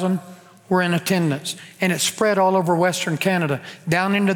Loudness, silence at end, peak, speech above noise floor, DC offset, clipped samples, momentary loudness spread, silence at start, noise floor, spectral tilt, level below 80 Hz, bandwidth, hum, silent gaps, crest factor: -20 LUFS; 0 s; -6 dBFS; 23 dB; under 0.1%; under 0.1%; 8 LU; 0 s; -43 dBFS; -4.5 dB/octave; -64 dBFS; 19.5 kHz; none; none; 16 dB